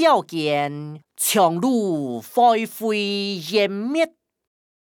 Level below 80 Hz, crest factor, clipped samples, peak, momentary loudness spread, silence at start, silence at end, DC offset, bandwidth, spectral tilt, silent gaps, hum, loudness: -76 dBFS; 16 dB; under 0.1%; -6 dBFS; 8 LU; 0 s; 0.75 s; under 0.1%; over 20 kHz; -4 dB/octave; none; none; -21 LUFS